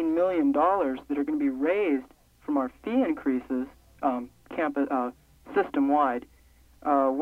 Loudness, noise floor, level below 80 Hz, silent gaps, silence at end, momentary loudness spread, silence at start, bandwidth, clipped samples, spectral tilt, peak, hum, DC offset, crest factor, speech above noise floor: -27 LUFS; -57 dBFS; -60 dBFS; none; 0 s; 11 LU; 0 s; 4.4 kHz; under 0.1%; -7 dB/octave; -12 dBFS; none; under 0.1%; 16 dB; 31 dB